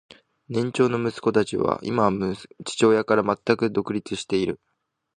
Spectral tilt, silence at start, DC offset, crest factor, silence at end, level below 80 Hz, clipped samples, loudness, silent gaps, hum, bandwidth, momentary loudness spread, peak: -5.5 dB/octave; 0.5 s; under 0.1%; 20 dB; 0.6 s; -56 dBFS; under 0.1%; -23 LUFS; none; none; 10 kHz; 10 LU; -4 dBFS